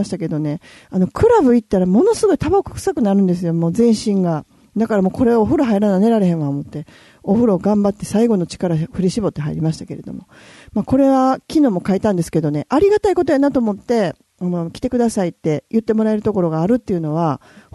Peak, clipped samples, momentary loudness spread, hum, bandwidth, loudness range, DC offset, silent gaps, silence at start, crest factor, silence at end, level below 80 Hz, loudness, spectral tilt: -4 dBFS; under 0.1%; 10 LU; none; 12.5 kHz; 3 LU; under 0.1%; none; 0 s; 12 dB; 0.35 s; -44 dBFS; -17 LUFS; -7.5 dB/octave